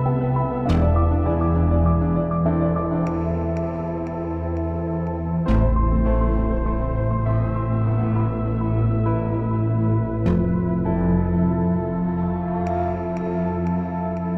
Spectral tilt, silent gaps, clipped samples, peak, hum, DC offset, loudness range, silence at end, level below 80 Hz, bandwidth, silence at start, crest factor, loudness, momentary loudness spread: -11 dB/octave; none; under 0.1%; -6 dBFS; none; under 0.1%; 3 LU; 0 s; -28 dBFS; 5.6 kHz; 0 s; 14 dB; -22 LUFS; 6 LU